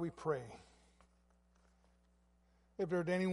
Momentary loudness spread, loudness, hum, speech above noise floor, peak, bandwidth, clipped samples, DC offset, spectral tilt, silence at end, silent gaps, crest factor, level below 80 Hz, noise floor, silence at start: 20 LU; -40 LUFS; none; 34 dB; -24 dBFS; 11.5 kHz; under 0.1%; under 0.1%; -7 dB/octave; 0 s; none; 18 dB; -70 dBFS; -72 dBFS; 0 s